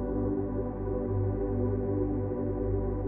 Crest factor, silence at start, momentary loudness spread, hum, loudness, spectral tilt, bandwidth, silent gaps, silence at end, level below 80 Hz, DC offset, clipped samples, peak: 12 dB; 0 s; 3 LU; 50 Hz at -35 dBFS; -31 LUFS; -13.5 dB/octave; 2.5 kHz; none; 0 s; -38 dBFS; under 0.1%; under 0.1%; -18 dBFS